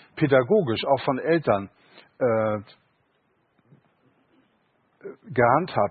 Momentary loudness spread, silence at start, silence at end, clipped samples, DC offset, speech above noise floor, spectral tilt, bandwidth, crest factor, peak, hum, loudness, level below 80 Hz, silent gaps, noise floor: 20 LU; 0.15 s; 0 s; under 0.1%; under 0.1%; 46 dB; -11 dB/octave; 4.8 kHz; 20 dB; -6 dBFS; none; -23 LUFS; -60 dBFS; none; -68 dBFS